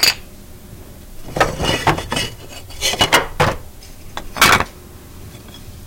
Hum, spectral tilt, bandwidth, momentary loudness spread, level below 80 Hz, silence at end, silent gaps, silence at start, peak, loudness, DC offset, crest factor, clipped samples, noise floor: none; -2.5 dB/octave; 17 kHz; 26 LU; -36 dBFS; 0 s; none; 0 s; 0 dBFS; -16 LUFS; under 0.1%; 20 dB; under 0.1%; -37 dBFS